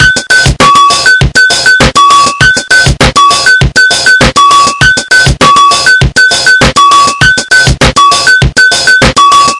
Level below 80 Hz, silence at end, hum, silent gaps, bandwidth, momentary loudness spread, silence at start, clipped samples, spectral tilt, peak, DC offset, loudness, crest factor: -20 dBFS; 0 s; none; none; 12 kHz; 2 LU; 0 s; 7%; -2.5 dB/octave; 0 dBFS; under 0.1%; -3 LUFS; 4 dB